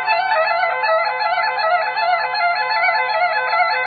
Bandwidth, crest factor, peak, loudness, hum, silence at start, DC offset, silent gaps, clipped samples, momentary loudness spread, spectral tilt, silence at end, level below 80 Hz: 4.9 kHz; 14 dB; -4 dBFS; -17 LUFS; none; 0 s; under 0.1%; none; under 0.1%; 2 LU; -5.5 dB/octave; 0 s; -72 dBFS